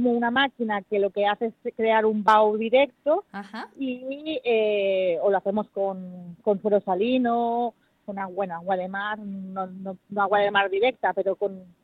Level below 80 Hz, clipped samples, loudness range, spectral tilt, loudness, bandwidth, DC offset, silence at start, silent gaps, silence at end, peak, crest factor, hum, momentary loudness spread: -70 dBFS; under 0.1%; 4 LU; -7 dB/octave; -24 LUFS; 8 kHz; under 0.1%; 0 s; none; 0.2 s; -6 dBFS; 18 dB; none; 12 LU